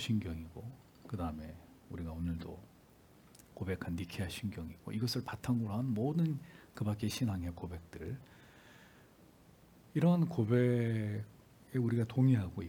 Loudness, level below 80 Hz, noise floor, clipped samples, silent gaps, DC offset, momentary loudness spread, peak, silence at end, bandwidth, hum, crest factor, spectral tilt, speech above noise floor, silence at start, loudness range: -36 LUFS; -62 dBFS; -62 dBFS; under 0.1%; none; under 0.1%; 19 LU; -18 dBFS; 0 s; 18 kHz; none; 20 dB; -7 dB/octave; 27 dB; 0 s; 9 LU